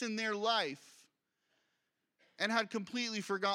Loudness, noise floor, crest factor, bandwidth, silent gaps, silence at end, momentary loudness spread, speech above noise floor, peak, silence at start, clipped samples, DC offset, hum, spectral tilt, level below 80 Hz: -35 LUFS; -84 dBFS; 22 dB; 16 kHz; none; 0 s; 6 LU; 48 dB; -16 dBFS; 0 s; under 0.1%; under 0.1%; none; -3 dB/octave; under -90 dBFS